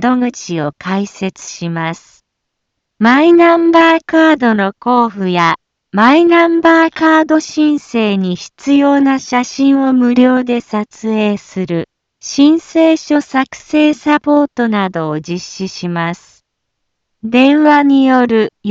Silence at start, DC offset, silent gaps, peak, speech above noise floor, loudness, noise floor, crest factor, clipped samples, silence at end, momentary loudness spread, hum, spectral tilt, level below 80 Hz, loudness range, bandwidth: 0 s; under 0.1%; none; 0 dBFS; 62 dB; -12 LUFS; -73 dBFS; 12 dB; under 0.1%; 0 s; 13 LU; none; -5.5 dB/octave; -56 dBFS; 5 LU; 7.8 kHz